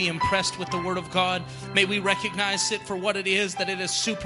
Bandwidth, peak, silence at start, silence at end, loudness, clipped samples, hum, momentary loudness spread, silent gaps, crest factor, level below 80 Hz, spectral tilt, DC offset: 11.5 kHz; -6 dBFS; 0 s; 0 s; -25 LUFS; under 0.1%; none; 5 LU; none; 20 dB; -54 dBFS; -2.5 dB/octave; under 0.1%